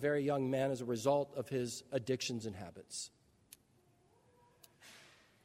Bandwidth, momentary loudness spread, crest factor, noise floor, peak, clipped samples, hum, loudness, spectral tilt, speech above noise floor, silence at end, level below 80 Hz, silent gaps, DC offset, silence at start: 16 kHz; 20 LU; 20 dB; -71 dBFS; -18 dBFS; under 0.1%; none; -38 LUFS; -5 dB/octave; 34 dB; 0.4 s; -76 dBFS; none; under 0.1%; 0 s